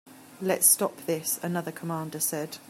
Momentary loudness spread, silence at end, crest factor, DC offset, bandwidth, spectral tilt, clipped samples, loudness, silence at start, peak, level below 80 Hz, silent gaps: 14 LU; 0 s; 22 dB; under 0.1%; 16 kHz; -3 dB/octave; under 0.1%; -26 LUFS; 0.05 s; -6 dBFS; -76 dBFS; none